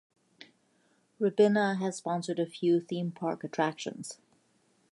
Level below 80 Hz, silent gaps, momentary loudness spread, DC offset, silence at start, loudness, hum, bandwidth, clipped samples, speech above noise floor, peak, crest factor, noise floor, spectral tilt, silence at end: -82 dBFS; none; 14 LU; under 0.1%; 0.4 s; -30 LUFS; none; 11.5 kHz; under 0.1%; 40 dB; -12 dBFS; 18 dB; -70 dBFS; -6 dB/octave; 0.8 s